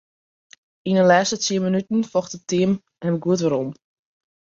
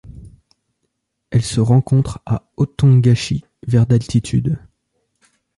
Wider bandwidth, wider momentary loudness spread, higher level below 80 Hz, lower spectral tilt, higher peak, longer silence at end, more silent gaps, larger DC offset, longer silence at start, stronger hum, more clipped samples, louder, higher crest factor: second, 7.8 kHz vs 11.5 kHz; about the same, 10 LU vs 11 LU; second, -62 dBFS vs -40 dBFS; second, -5 dB/octave vs -7 dB/octave; about the same, -2 dBFS vs -2 dBFS; second, 0.85 s vs 1 s; neither; neither; first, 0.85 s vs 0.05 s; neither; neither; second, -21 LUFS vs -17 LUFS; first, 20 dB vs 14 dB